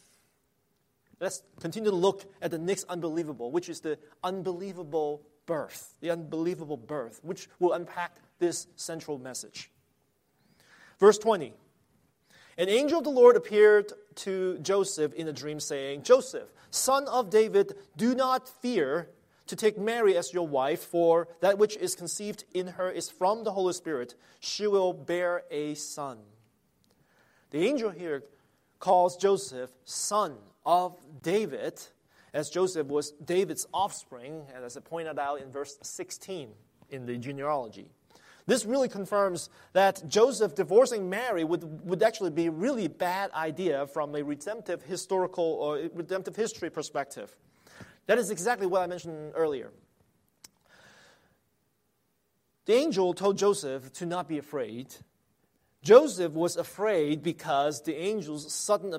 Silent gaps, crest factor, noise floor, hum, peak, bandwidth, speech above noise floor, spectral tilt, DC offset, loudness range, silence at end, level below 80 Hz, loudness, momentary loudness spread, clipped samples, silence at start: none; 24 dB; -75 dBFS; none; -4 dBFS; 16 kHz; 47 dB; -4 dB/octave; under 0.1%; 9 LU; 0 s; -76 dBFS; -29 LUFS; 15 LU; under 0.1%; 1.2 s